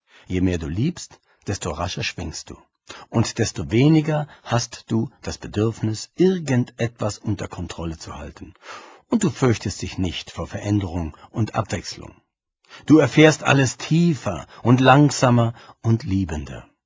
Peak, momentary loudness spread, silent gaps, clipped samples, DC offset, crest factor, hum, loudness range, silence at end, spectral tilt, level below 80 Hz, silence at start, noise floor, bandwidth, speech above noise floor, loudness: 0 dBFS; 20 LU; none; under 0.1%; under 0.1%; 22 dB; none; 9 LU; 0.25 s; -6 dB/octave; -42 dBFS; 0.3 s; -57 dBFS; 8 kHz; 36 dB; -21 LUFS